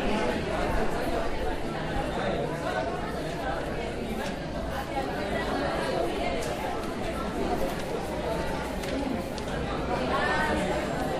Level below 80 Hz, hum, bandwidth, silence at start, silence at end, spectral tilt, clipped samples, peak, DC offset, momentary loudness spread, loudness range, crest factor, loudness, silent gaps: -38 dBFS; none; 15.5 kHz; 0 s; 0 s; -5.5 dB/octave; under 0.1%; -14 dBFS; under 0.1%; 5 LU; 2 LU; 14 dB; -30 LUFS; none